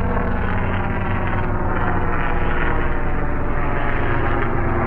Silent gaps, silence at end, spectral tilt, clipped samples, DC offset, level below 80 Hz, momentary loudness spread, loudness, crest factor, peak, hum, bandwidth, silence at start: none; 0 s; -9.5 dB/octave; under 0.1%; under 0.1%; -22 dBFS; 2 LU; -22 LUFS; 12 dB; -6 dBFS; none; 3.5 kHz; 0 s